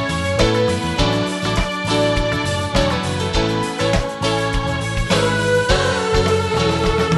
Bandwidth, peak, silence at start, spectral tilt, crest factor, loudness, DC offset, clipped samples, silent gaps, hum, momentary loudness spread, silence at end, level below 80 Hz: 12 kHz; -2 dBFS; 0 s; -5 dB/octave; 16 dB; -18 LUFS; under 0.1%; under 0.1%; none; none; 4 LU; 0 s; -28 dBFS